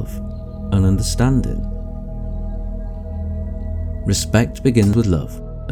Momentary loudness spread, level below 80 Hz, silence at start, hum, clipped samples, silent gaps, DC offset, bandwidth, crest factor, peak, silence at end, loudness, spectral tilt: 14 LU; -26 dBFS; 0 s; 60 Hz at -40 dBFS; under 0.1%; none; under 0.1%; 17.5 kHz; 18 dB; -2 dBFS; 0 s; -20 LUFS; -6 dB/octave